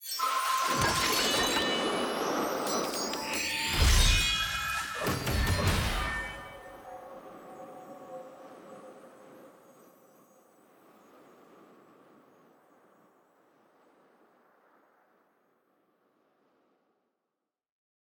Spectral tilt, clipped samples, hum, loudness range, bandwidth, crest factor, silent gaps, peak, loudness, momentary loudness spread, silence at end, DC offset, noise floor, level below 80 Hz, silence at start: -3 dB/octave; under 0.1%; none; 22 LU; over 20 kHz; 22 dB; none; -10 dBFS; -28 LUFS; 22 LU; 8.5 s; under 0.1%; -87 dBFS; -40 dBFS; 0 s